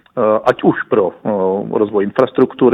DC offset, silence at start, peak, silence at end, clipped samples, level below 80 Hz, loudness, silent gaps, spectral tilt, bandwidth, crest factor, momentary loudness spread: under 0.1%; 0.15 s; 0 dBFS; 0 s; under 0.1%; -56 dBFS; -15 LUFS; none; -8 dB/octave; 6.6 kHz; 14 dB; 4 LU